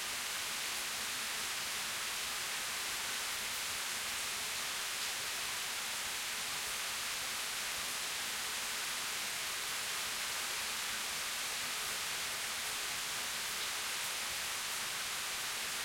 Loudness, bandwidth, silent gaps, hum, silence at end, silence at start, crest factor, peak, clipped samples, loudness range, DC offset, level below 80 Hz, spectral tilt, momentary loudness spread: -36 LUFS; 16.5 kHz; none; none; 0 s; 0 s; 14 dB; -26 dBFS; under 0.1%; 0 LU; under 0.1%; -68 dBFS; 1 dB/octave; 1 LU